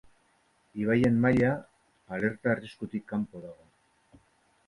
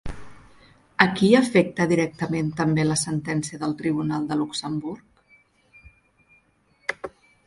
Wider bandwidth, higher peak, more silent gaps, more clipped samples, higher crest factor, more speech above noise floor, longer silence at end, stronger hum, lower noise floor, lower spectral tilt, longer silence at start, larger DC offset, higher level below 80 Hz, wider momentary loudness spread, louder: about the same, 11 kHz vs 11.5 kHz; second, -12 dBFS vs -2 dBFS; neither; neither; second, 18 dB vs 24 dB; about the same, 40 dB vs 40 dB; first, 1.15 s vs 0.4 s; neither; first, -68 dBFS vs -63 dBFS; first, -8.5 dB/octave vs -5 dB/octave; first, 0.75 s vs 0.05 s; neither; second, -58 dBFS vs -50 dBFS; about the same, 17 LU vs 18 LU; second, -29 LUFS vs -23 LUFS